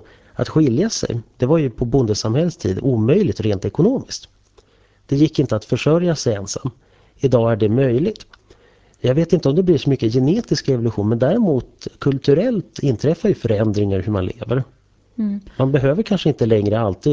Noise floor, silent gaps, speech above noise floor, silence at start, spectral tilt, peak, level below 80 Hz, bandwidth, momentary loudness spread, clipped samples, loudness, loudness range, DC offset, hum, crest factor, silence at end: -53 dBFS; none; 36 dB; 0.4 s; -7 dB/octave; -2 dBFS; -42 dBFS; 8 kHz; 8 LU; under 0.1%; -18 LUFS; 2 LU; under 0.1%; none; 16 dB; 0 s